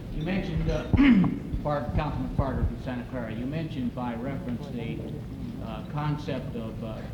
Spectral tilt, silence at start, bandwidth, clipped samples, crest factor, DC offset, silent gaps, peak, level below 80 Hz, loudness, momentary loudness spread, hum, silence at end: -8.5 dB/octave; 0 s; 17.5 kHz; under 0.1%; 18 dB; under 0.1%; none; -10 dBFS; -38 dBFS; -29 LUFS; 13 LU; none; 0 s